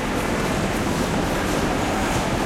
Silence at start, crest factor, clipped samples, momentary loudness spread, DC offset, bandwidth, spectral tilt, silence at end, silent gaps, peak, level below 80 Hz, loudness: 0 s; 12 dB; under 0.1%; 1 LU; under 0.1%; 16.5 kHz; -5 dB/octave; 0 s; none; -10 dBFS; -34 dBFS; -22 LUFS